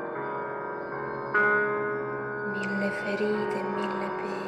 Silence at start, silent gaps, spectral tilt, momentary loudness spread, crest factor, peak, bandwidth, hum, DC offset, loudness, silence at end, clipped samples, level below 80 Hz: 0 s; none; -6.5 dB/octave; 10 LU; 16 dB; -12 dBFS; 10.5 kHz; none; under 0.1%; -29 LUFS; 0 s; under 0.1%; -66 dBFS